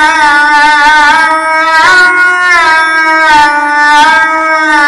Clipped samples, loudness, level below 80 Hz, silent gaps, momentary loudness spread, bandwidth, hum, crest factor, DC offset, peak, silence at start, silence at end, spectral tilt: under 0.1%; -4 LUFS; -38 dBFS; none; 3 LU; 14 kHz; none; 6 dB; under 0.1%; 0 dBFS; 0 s; 0 s; -1 dB/octave